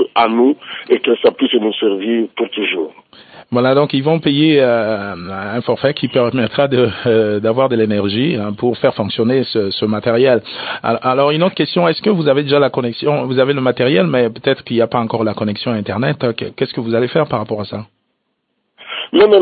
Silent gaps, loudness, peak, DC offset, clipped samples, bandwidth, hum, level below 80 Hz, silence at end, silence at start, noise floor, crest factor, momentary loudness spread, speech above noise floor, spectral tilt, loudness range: none; -15 LUFS; 0 dBFS; under 0.1%; under 0.1%; 4.8 kHz; none; -56 dBFS; 0 s; 0 s; -69 dBFS; 14 dB; 8 LU; 54 dB; -11.5 dB/octave; 3 LU